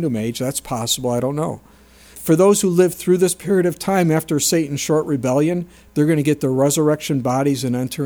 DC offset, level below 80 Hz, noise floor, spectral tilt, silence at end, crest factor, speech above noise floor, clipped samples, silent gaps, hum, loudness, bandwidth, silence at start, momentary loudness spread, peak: under 0.1%; -52 dBFS; -42 dBFS; -5 dB/octave; 0 s; 16 dB; 24 dB; under 0.1%; none; none; -18 LUFS; over 20 kHz; 0 s; 8 LU; -2 dBFS